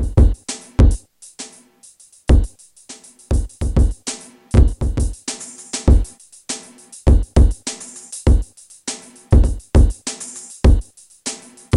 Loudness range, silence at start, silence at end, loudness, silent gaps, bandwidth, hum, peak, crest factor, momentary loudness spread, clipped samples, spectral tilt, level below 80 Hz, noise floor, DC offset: 3 LU; 0 s; 0 s; -19 LUFS; none; 11.5 kHz; none; 0 dBFS; 16 dB; 18 LU; under 0.1%; -6 dB/octave; -18 dBFS; -48 dBFS; under 0.1%